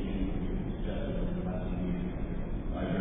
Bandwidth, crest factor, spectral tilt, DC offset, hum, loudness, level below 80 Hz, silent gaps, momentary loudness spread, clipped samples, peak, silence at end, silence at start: 3.8 kHz; 14 dB; -11.5 dB/octave; under 0.1%; none; -35 LUFS; -36 dBFS; none; 3 LU; under 0.1%; -20 dBFS; 0 s; 0 s